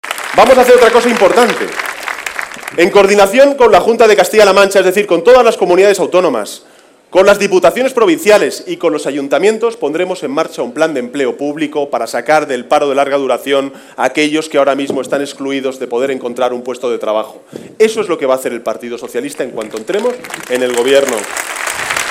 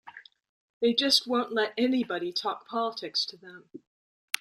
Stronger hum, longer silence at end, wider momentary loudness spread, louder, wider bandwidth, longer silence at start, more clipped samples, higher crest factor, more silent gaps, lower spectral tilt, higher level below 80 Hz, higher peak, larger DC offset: neither; second, 0 s vs 0.65 s; about the same, 12 LU vs 11 LU; first, -12 LUFS vs -28 LUFS; about the same, 16.5 kHz vs 16 kHz; about the same, 0.05 s vs 0.05 s; first, 0.3% vs under 0.1%; second, 12 dB vs 22 dB; second, none vs 0.49-0.81 s; about the same, -3.5 dB/octave vs -2.5 dB/octave; first, -48 dBFS vs -76 dBFS; first, 0 dBFS vs -8 dBFS; neither